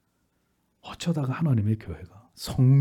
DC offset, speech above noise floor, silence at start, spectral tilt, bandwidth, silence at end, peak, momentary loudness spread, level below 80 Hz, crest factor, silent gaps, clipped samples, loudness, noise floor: under 0.1%; 48 dB; 0.85 s; -7.5 dB/octave; 13.5 kHz; 0 s; -12 dBFS; 19 LU; -54 dBFS; 14 dB; none; under 0.1%; -26 LUFS; -72 dBFS